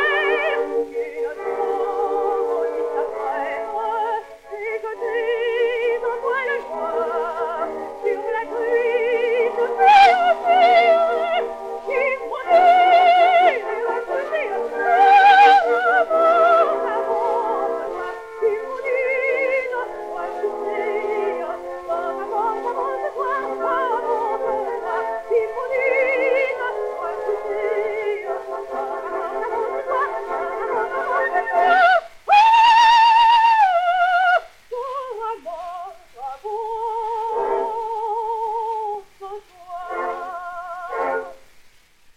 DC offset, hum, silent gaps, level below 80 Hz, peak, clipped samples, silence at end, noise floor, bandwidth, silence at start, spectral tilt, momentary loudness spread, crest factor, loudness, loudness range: under 0.1%; none; none; -58 dBFS; -2 dBFS; under 0.1%; 0.8 s; -51 dBFS; 12 kHz; 0 s; -2 dB/octave; 15 LU; 18 dB; -19 LUFS; 10 LU